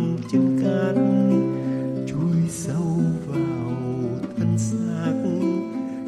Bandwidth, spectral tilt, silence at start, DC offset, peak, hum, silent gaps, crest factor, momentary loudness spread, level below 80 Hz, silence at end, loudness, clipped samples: 12.5 kHz; -7.5 dB/octave; 0 s; under 0.1%; -8 dBFS; none; none; 14 dB; 7 LU; -56 dBFS; 0 s; -23 LUFS; under 0.1%